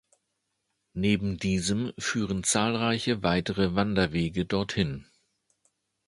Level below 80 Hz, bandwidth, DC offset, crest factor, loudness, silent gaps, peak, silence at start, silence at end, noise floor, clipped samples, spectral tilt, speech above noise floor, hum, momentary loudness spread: -50 dBFS; 11.5 kHz; under 0.1%; 20 dB; -27 LUFS; none; -8 dBFS; 0.95 s; 1.05 s; -79 dBFS; under 0.1%; -4.5 dB/octave; 52 dB; none; 5 LU